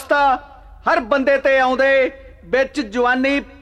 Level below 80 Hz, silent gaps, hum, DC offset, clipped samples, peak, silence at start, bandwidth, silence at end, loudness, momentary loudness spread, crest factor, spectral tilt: -44 dBFS; none; none; under 0.1%; under 0.1%; -4 dBFS; 0 s; 12 kHz; 0.15 s; -17 LUFS; 7 LU; 14 dB; -4 dB/octave